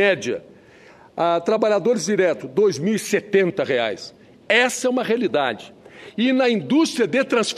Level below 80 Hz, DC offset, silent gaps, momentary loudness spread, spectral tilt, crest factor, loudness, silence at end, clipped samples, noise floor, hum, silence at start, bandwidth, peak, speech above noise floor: -68 dBFS; under 0.1%; none; 9 LU; -4 dB/octave; 16 dB; -20 LUFS; 0 s; under 0.1%; -48 dBFS; none; 0 s; 13.5 kHz; -4 dBFS; 28 dB